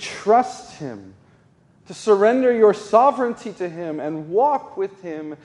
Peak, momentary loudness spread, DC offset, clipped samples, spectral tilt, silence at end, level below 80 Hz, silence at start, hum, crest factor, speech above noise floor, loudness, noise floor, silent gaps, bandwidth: -2 dBFS; 18 LU; under 0.1%; under 0.1%; -5.5 dB/octave; 0.1 s; -68 dBFS; 0 s; none; 18 dB; 36 dB; -19 LUFS; -55 dBFS; none; 11 kHz